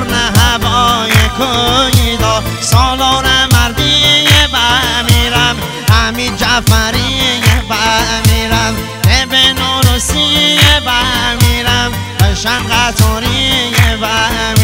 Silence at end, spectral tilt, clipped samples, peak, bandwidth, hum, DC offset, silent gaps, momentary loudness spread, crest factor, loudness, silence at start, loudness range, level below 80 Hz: 0 s; -3.5 dB/octave; 1%; 0 dBFS; over 20 kHz; none; under 0.1%; none; 5 LU; 10 dB; -10 LUFS; 0 s; 2 LU; -20 dBFS